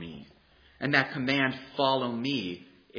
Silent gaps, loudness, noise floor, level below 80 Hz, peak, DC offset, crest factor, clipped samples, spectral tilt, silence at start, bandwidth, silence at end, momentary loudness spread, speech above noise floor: none; -28 LUFS; -60 dBFS; -66 dBFS; -6 dBFS; under 0.1%; 24 dB; under 0.1%; -6 dB/octave; 0 s; 5.4 kHz; 0 s; 17 LU; 31 dB